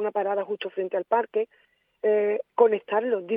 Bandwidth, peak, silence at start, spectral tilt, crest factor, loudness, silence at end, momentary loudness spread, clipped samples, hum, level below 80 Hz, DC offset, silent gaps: 3.7 kHz; -6 dBFS; 0 s; -8 dB/octave; 18 dB; -26 LUFS; 0 s; 8 LU; under 0.1%; none; -86 dBFS; under 0.1%; none